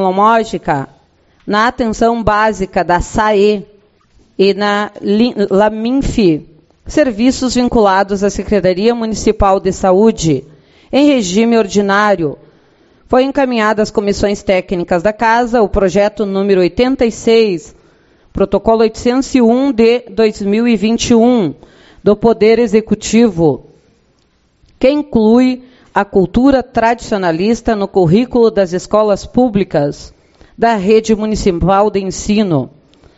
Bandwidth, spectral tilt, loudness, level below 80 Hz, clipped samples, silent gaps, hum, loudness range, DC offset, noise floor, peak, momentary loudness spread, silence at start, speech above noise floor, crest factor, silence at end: 8.2 kHz; -5.5 dB/octave; -12 LUFS; -32 dBFS; under 0.1%; none; none; 2 LU; under 0.1%; -55 dBFS; 0 dBFS; 6 LU; 0 s; 44 dB; 12 dB; 0.5 s